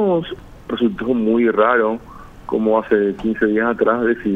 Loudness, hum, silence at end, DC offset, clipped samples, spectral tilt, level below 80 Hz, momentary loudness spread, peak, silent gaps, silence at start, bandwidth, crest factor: -18 LUFS; none; 0 s; under 0.1%; under 0.1%; -8 dB/octave; -46 dBFS; 13 LU; -2 dBFS; none; 0 s; 4 kHz; 16 dB